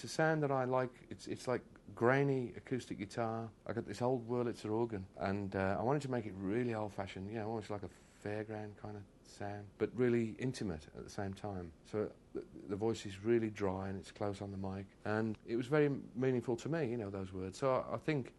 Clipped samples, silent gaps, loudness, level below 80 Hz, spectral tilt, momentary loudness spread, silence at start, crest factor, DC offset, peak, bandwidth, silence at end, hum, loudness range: under 0.1%; none; -39 LUFS; -68 dBFS; -7 dB/octave; 13 LU; 0 s; 24 dB; under 0.1%; -16 dBFS; 12 kHz; 0.05 s; none; 4 LU